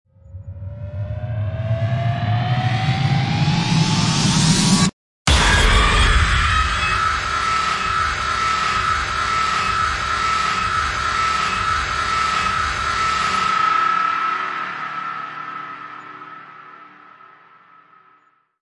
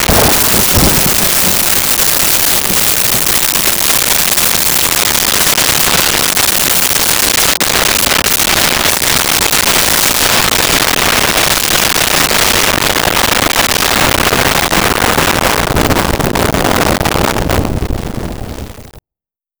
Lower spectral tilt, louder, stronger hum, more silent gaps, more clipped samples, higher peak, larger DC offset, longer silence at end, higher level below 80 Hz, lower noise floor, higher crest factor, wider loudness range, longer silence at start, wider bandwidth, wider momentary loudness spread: first, -4 dB/octave vs -2 dB/octave; second, -18 LUFS vs -8 LUFS; neither; first, 4.93-5.25 s vs none; neither; second, -4 dBFS vs 0 dBFS; neither; first, 1.75 s vs 0.6 s; about the same, -30 dBFS vs -26 dBFS; second, -58 dBFS vs -88 dBFS; about the same, 16 dB vs 12 dB; first, 10 LU vs 4 LU; first, 0.25 s vs 0 s; second, 11.5 kHz vs over 20 kHz; first, 15 LU vs 5 LU